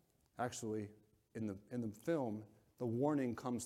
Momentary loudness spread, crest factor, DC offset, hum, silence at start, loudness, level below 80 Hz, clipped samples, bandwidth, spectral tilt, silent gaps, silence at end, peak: 13 LU; 18 dB; under 0.1%; none; 0.4 s; -42 LUFS; -78 dBFS; under 0.1%; 16 kHz; -6.5 dB/octave; none; 0 s; -24 dBFS